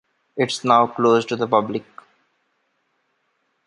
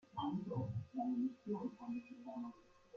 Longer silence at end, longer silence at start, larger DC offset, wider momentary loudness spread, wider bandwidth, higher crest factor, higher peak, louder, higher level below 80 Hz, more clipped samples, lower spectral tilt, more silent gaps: first, 1.85 s vs 0 s; first, 0.35 s vs 0.15 s; neither; first, 13 LU vs 9 LU; first, 11.5 kHz vs 7 kHz; first, 20 dB vs 14 dB; first, -2 dBFS vs -30 dBFS; first, -19 LUFS vs -44 LUFS; first, -68 dBFS vs -76 dBFS; neither; second, -5 dB/octave vs -9 dB/octave; neither